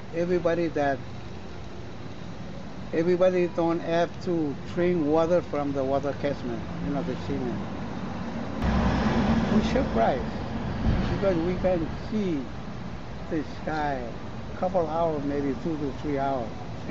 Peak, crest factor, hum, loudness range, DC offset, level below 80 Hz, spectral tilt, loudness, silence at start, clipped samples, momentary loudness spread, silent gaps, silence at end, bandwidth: -12 dBFS; 16 dB; none; 5 LU; 1%; -40 dBFS; -7.5 dB/octave; -27 LUFS; 0 s; under 0.1%; 15 LU; none; 0 s; 7.6 kHz